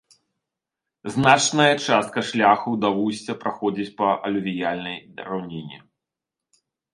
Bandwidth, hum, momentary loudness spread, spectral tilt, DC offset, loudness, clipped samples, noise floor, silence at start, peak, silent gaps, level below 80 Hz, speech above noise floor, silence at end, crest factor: 11.5 kHz; none; 16 LU; -4 dB/octave; under 0.1%; -21 LUFS; under 0.1%; -87 dBFS; 1.05 s; 0 dBFS; none; -64 dBFS; 65 dB; 1.15 s; 22 dB